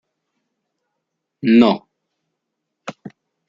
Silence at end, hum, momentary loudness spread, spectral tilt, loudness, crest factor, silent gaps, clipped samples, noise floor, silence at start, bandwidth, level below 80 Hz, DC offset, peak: 0.4 s; none; 23 LU; -7 dB/octave; -15 LUFS; 20 dB; none; under 0.1%; -78 dBFS; 1.45 s; 7.2 kHz; -64 dBFS; under 0.1%; -2 dBFS